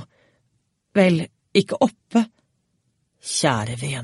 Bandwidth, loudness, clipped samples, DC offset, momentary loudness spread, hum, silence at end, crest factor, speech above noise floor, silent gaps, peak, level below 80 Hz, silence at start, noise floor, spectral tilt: 11.5 kHz; -21 LUFS; under 0.1%; under 0.1%; 8 LU; none; 0 s; 20 dB; 50 dB; none; -4 dBFS; -60 dBFS; 0 s; -70 dBFS; -5 dB/octave